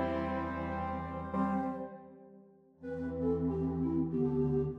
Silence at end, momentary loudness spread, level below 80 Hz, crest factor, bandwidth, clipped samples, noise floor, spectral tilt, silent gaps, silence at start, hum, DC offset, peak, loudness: 0 s; 12 LU; -52 dBFS; 14 dB; 5.6 kHz; under 0.1%; -59 dBFS; -10 dB/octave; none; 0 s; none; under 0.1%; -20 dBFS; -35 LUFS